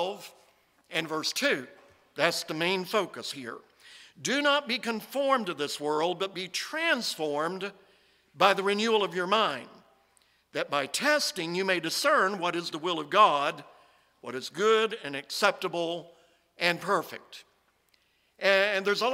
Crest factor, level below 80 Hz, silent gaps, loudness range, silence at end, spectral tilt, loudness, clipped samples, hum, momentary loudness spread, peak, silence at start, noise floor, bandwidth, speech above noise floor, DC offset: 22 dB; -80 dBFS; none; 4 LU; 0 s; -3 dB/octave; -28 LUFS; under 0.1%; none; 14 LU; -6 dBFS; 0 s; -69 dBFS; 16 kHz; 41 dB; under 0.1%